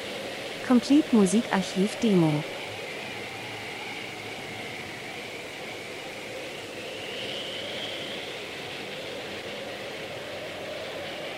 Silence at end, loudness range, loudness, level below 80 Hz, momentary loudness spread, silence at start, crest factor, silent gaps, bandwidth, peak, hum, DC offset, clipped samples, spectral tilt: 0 s; 11 LU; -30 LUFS; -66 dBFS; 14 LU; 0 s; 22 dB; none; 16 kHz; -8 dBFS; none; under 0.1%; under 0.1%; -5 dB/octave